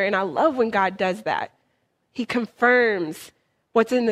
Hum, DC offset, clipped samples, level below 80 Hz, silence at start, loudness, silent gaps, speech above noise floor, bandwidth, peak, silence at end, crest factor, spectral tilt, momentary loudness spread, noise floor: none; under 0.1%; under 0.1%; -66 dBFS; 0 s; -22 LUFS; none; 48 dB; 14.5 kHz; -4 dBFS; 0 s; 20 dB; -5 dB/octave; 14 LU; -70 dBFS